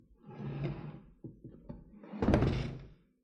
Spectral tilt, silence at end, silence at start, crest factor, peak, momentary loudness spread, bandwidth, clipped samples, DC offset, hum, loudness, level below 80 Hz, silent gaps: -8.5 dB/octave; 0.3 s; 0.25 s; 24 dB; -14 dBFS; 22 LU; 10 kHz; under 0.1%; under 0.1%; none; -35 LUFS; -46 dBFS; none